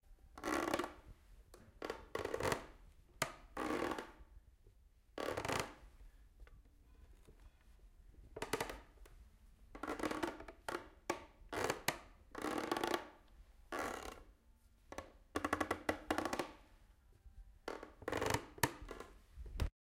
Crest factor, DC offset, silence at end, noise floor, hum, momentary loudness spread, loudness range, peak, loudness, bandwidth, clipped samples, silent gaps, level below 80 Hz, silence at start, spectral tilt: 32 dB; under 0.1%; 0.3 s; -68 dBFS; none; 22 LU; 6 LU; -14 dBFS; -43 LUFS; 16.5 kHz; under 0.1%; none; -58 dBFS; 0.05 s; -4 dB/octave